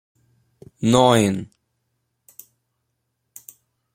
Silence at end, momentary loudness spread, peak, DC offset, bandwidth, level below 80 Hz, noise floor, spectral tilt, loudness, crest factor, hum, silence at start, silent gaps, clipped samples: 2.5 s; 27 LU; -2 dBFS; under 0.1%; 16.5 kHz; -58 dBFS; -75 dBFS; -5.5 dB/octave; -18 LUFS; 22 dB; none; 0.8 s; none; under 0.1%